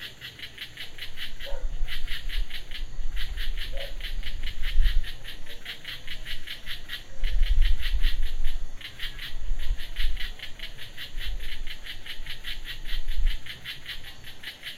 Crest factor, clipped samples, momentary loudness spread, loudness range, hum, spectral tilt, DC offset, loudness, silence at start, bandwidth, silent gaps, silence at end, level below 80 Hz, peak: 18 dB; under 0.1%; 9 LU; 4 LU; none; -3 dB/octave; under 0.1%; -35 LUFS; 0 s; 13 kHz; none; 0 s; -28 dBFS; -6 dBFS